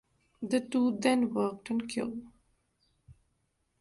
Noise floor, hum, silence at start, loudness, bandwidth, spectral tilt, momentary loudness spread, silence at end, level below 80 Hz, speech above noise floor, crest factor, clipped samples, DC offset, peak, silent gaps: -77 dBFS; none; 0.4 s; -31 LUFS; 11.5 kHz; -5 dB/octave; 11 LU; 0.7 s; -70 dBFS; 47 dB; 20 dB; under 0.1%; under 0.1%; -14 dBFS; none